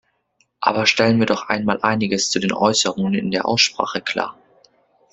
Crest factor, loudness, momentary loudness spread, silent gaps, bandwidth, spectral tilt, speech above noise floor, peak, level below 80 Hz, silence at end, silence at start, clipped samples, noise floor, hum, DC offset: 20 dB; -18 LUFS; 7 LU; none; 8.2 kHz; -3.5 dB/octave; 46 dB; 0 dBFS; -58 dBFS; 0.8 s; 0.6 s; under 0.1%; -65 dBFS; none; under 0.1%